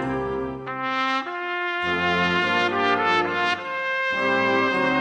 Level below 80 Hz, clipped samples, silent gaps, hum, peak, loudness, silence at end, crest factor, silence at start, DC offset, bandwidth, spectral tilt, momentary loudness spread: -54 dBFS; under 0.1%; none; none; -8 dBFS; -22 LUFS; 0 s; 16 dB; 0 s; under 0.1%; 10 kHz; -5 dB/octave; 7 LU